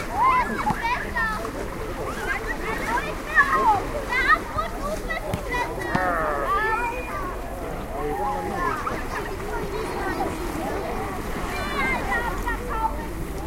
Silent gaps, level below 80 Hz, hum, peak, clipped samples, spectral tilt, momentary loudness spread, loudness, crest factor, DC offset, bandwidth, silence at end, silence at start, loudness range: none; -34 dBFS; none; -4 dBFS; under 0.1%; -5 dB/octave; 10 LU; -25 LUFS; 20 dB; under 0.1%; 16 kHz; 0 s; 0 s; 5 LU